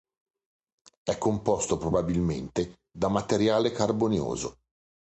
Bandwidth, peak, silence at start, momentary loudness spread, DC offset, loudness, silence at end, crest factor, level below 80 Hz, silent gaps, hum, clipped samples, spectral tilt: 9.4 kHz; -10 dBFS; 1.05 s; 9 LU; under 0.1%; -28 LUFS; 0.6 s; 18 dB; -48 dBFS; none; none; under 0.1%; -5.5 dB/octave